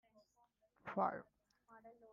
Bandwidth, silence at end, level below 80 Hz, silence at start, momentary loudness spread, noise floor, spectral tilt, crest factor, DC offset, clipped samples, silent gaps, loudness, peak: 7.2 kHz; 0 s; -86 dBFS; 0.85 s; 22 LU; -78 dBFS; -6 dB/octave; 22 dB; under 0.1%; under 0.1%; none; -43 LUFS; -26 dBFS